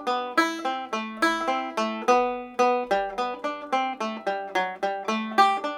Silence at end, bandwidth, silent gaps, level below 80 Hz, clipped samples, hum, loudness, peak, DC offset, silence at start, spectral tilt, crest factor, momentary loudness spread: 0 s; 16.5 kHz; none; -64 dBFS; under 0.1%; none; -26 LUFS; -6 dBFS; under 0.1%; 0 s; -3 dB/octave; 20 dB; 8 LU